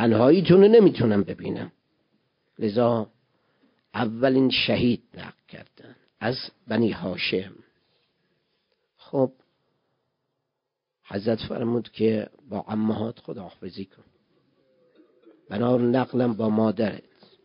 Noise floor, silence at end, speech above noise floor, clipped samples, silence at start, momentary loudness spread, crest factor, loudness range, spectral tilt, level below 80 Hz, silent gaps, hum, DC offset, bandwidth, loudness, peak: -83 dBFS; 0.45 s; 60 dB; under 0.1%; 0 s; 21 LU; 20 dB; 9 LU; -11 dB/octave; -58 dBFS; none; none; under 0.1%; 5.4 kHz; -23 LUFS; -4 dBFS